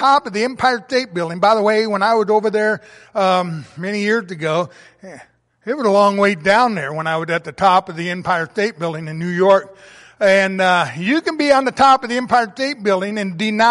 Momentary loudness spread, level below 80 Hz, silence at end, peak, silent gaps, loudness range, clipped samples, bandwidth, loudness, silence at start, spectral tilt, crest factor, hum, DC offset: 9 LU; -58 dBFS; 0 s; -2 dBFS; none; 4 LU; under 0.1%; 11.5 kHz; -17 LUFS; 0 s; -5 dB/octave; 14 dB; none; under 0.1%